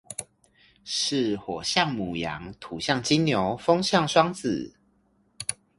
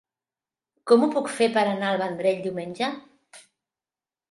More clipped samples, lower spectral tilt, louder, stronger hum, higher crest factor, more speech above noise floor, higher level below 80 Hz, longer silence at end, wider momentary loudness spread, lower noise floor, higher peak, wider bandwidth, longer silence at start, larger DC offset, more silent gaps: neither; about the same, -4 dB/octave vs -5 dB/octave; about the same, -25 LUFS vs -24 LUFS; neither; about the same, 22 dB vs 22 dB; second, 40 dB vs over 67 dB; first, -56 dBFS vs -76 dBFS; second, 0.25 s vs 0.9 s; first, 15 LU vs 11 LU; second, -66 dBFS vs under -90 dBFS; about the same, -4 dBFS vs -4 dBFS; about the same, 11.5 kHz vs 11.5 kHz; second, 0.1 s vs 0.85 s; neither; neither